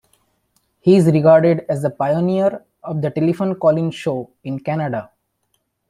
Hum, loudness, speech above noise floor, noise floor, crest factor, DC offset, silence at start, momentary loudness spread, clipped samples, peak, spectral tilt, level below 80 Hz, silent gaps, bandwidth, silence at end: none; -17 LUFS; 52 dB; -69 dBFS; 18 dB; under 0.1%; 0.85 s; 15 LU; under 0.1%; 0 dBFS; -8.5 dB/octave; -58 dBFS; none; 12 kHz; 0.85 s